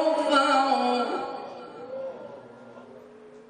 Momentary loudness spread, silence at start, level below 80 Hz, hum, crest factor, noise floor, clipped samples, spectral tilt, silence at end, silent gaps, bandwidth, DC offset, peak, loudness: 25 LU; 0 s; -74 dBFS; none; 18 dB; -48 dBFS; under 0.1%; -3 dB/octave; 0.05 s; none; 10.5 kHz; under 0.1%; -8 dBFS; -25 LUFS